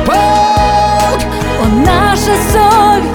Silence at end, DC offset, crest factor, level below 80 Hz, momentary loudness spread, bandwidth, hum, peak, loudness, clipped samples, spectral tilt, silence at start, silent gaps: 0 s; under 0.1%; 10 dB; -20 dBFS; 6 LU; 19.5 kHz; none; 0 dBFS; -9 LUFS; under 0.1%; -5 dB/octave; 0 s; none